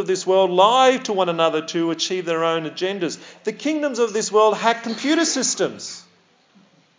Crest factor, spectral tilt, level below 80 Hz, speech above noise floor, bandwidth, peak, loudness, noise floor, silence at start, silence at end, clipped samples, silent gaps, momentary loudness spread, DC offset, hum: 18 dB; -3 dB/octave; -86 dBFS; 38 dB; 7.8 kHz; -2 dBFS; -20 LUFS; -57 dBFS; 0 s; 0.95 s; under 0.1%; none; 12 LU; under 0.1%; none